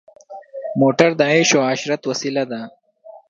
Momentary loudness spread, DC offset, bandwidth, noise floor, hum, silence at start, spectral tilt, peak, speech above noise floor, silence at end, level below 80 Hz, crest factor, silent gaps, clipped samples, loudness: 17 LU; under 0.1%; 7.6 kHz; -44 dBFS; none; 0.3 s; -4 dB/octave; 0 dBFS; 27 dB; 0.1 s; -66 dBFS; 18 dB; none; under 0.1%; -17 LUFS